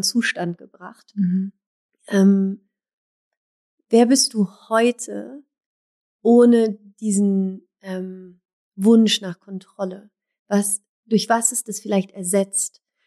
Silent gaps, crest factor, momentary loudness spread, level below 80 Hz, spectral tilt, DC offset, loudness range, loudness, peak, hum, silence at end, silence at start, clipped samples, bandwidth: 1.66-1.89 s, 2.93-3.31 s, 3.37-3.78 s, 5.66-6.19 s, 8.53-8.72 s, 10.39-10.46 s, 10.89-11.03 s; 16 dB; 17 LU; -82 dBFS; -4.5 dB/octave; under 0.1%; 4 LU; -19 LUFS; -4 dBFS; none; 0.4 s; 0 s; under 0.1%; 14 kHz